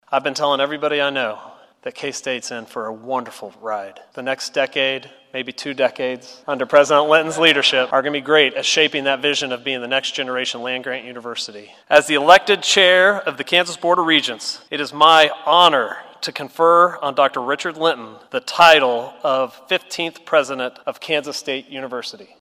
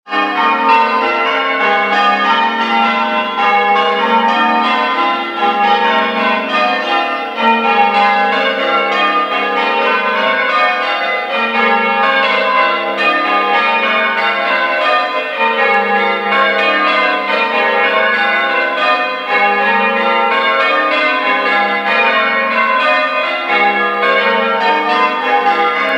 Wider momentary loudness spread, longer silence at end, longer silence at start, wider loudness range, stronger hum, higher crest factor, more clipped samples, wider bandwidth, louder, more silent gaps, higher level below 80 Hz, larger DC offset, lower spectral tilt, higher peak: first, 16 LU vs 3 LU; first, 0.2 s vs 0 s; about the same, 0.1 s vs 0.05 s; first, 9 LU vs 1 LU; neither; first, 18 dB vs 12 dB; first, 0.1% vs under 0.1%; second, 15.5 kHz vs 19 kHz; second, -17 LUFS vs -12 LUFS; neither; about the same, -66 dBFS vs -68 dBFS; neither; second, -2 dB/octave vs -4 dB/octave; about the same, 0 dBFS vs 0 dBFS